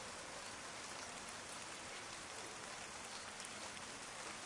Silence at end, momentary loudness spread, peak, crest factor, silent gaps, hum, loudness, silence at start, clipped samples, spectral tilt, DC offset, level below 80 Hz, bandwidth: 0 s; 1 LU; -30 dBFS; 20 dB; none; none; -48 LUFS; 0 s; under 0.1%; -1 dB/octave; under 0.1%; -76 dBFS; 12 kHz